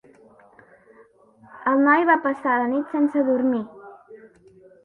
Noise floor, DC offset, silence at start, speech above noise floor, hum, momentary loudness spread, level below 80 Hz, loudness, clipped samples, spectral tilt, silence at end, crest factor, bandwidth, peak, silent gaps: -54 dBFS; under 0.1%; 1.55 s; 34 dB; none; 10 LU; -72 dBFS; -21 LUFS; under 0.1%; -7.5 dB/octave; 0.6 s; 18 dB; 4.3 kHz; -4 dBFS; none